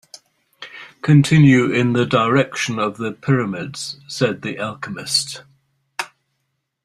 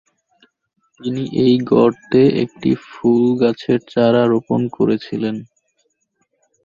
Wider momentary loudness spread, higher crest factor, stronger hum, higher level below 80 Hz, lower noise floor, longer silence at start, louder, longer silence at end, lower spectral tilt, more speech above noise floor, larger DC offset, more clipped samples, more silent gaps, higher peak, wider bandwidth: first, 20 LU vs 10 LU; about the same, 18 dB vs 16 dB; neither; about the same, -56 dBFS vs -56 dBFS; first, -73 dBFS vs -68 dBFS; second, 0.6 s vs 1 s; about the same, -18 LUFS vs -17 LUFS; second, 0.8 s vs 1.2 s; second, -5.5 dB/octave vs -8.5 dB/octave; first, 56 dB vs 52 dB; neither; neither; neither; about the same, -2 dBFS vs -2 dBFS; first, 13 kHz vs 7.2 kHz